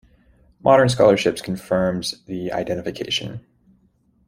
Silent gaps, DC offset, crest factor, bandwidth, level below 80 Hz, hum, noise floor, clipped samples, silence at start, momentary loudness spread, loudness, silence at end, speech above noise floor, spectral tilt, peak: none; under 0.1%; 18 dB; 15.5 kHz; -52 dBFS; none; -61 dBFS; under 0.1%; 0.65 s; 13 LU; -20 LUFS; 0.9 s; 41 dB; -5 dB/octave; -2 dBFS